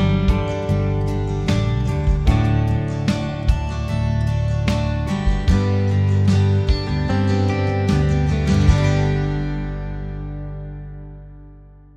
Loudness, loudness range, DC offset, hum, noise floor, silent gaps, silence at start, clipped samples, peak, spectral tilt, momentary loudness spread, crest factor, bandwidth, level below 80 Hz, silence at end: -20 LUFS; 3 LU; under 0.1%; none; -43 dBFS; none; 0 s; under 0.1%; -2 dBFS; -7.5 dB/octave; 12 LU; 16 dB; 9.4 kHz; -24 dBFS; 0.3 s